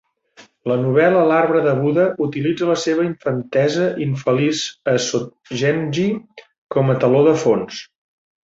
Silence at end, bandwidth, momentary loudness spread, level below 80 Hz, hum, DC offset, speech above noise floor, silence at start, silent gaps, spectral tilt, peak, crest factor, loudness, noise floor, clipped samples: 0.6 s; 7.8 kHz; 9 LU; -60 dBFS; none; under 0.1%; 32 dB; 0.4 s; 6.58-6.69 s; -6 dB/octave; -2 dBFS; 16 dB; -18 LUFS; -50 dBFS; under 0.1%